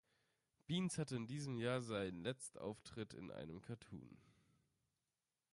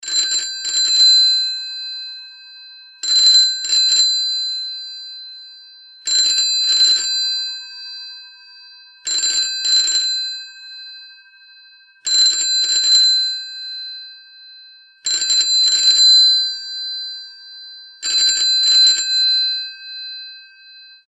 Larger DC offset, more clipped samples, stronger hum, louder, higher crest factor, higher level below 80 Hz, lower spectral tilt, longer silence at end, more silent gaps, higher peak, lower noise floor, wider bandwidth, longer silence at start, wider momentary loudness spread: neither; neither; neither; second, -46 LUFS vs -13 LUFS; about the same, 20 dB vs 16 dB; about the same, -74 dBFS vs -76 dBFS; first, -5.5 dB/octave vs 5 dB/octave; first, 1.2 s vs 0.25 s; neither; second, -30 dBFS vs -2 dBFS; first, under -90 dBFS vs -47 dBFS; about the same, 11.5 kHz vs 11 kHz; first, 0.7 s vs 0.05 s; second, 13 LU vs 22 LU